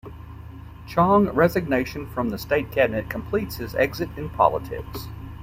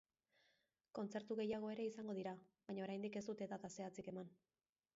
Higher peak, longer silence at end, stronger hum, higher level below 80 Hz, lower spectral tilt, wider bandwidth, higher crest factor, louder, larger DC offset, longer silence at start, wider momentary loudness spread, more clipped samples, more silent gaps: first, -2 dBFS vs -34 dBFS; second, 0 s vs 0.65 s; neither; first, -42 dBFS vs -86 dBFS; about the same, -7 dB/octave vs -6 dB/octave; first, 16 kHz vs 7.6 kHz; first, 22 dB vs 16 dB; first, -23 LUFS vs -49 LUFS; neither; second, 0.05 s vs 0.95 s; first, 22 LU vs 9 LU; neither; neither